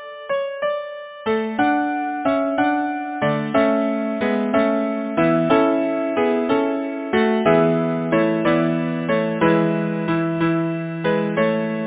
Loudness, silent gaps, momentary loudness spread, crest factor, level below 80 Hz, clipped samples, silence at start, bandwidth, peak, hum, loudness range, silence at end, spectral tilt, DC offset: -20 LUFS; none; 7 LU; 16 dB; -56 dBFS; under 0.1%; 0 s; 4 kHz; -4 dBFS; none; 2 LU; 0 s; -10.5 dB/octave; under 0.1%